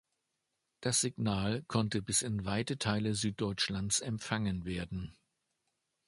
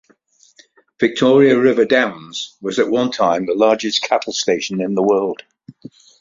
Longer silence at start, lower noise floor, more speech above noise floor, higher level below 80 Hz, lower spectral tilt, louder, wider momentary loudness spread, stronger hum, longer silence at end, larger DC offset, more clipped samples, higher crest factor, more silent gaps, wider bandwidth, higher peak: second, 0.8 s vs 1 s; first, -84 dBFS vs -54 dBFS; first, 50 dB vs 38 dB; about the same, -56 dBFS vs -60 dBFS; about the same, -4 dB/octave vs -4.5 dB/octave; second, -34 LUFS vs -16 LUFS; second, 8 LU vs 11 LU; neither; first, 0.95 s vs 0.5 s; neither; neither; about the same, 20 dB vs 16 dB; neither; first, 12 kHz vs 7.6 kHz; second, -14 dBFS vs -2 dBFS